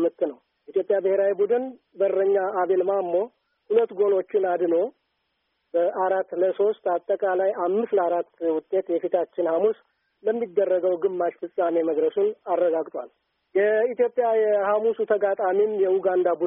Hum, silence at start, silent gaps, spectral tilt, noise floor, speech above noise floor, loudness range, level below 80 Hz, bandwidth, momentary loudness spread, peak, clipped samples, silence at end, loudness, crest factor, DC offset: none; 0 s; none; -5 dB/octave; -75 dBFS; 52 dB; 2 LU; -76 dBFS; 3.7 kHz; 6 LU; -8 dBFS; under 0.1%; 0 s; -24 LUFS; 14 dB; under 0.1%